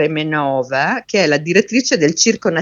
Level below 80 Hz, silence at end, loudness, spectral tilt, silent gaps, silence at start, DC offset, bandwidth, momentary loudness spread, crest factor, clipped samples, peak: -60 dBFS; 0 s; -15 LUFS; -3.5 dB/octave; none; 0 s; under 0.1%; 7.8 kHz; 4 LU; 16 dB; under 0.1%; 0 dBFS